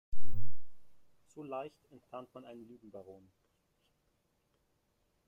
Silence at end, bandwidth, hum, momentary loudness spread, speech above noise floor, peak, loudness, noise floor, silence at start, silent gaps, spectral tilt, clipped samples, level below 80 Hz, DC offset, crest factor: 3.1 s; 16.5 kHz; none; 16 LU; 29 dB; -16 dBFS; -49 LUFS; -77 dBFS; 0.15 s; none; -8 dB/octave; under 0.1%; -54 dBFS; under 0.1%; 14 dB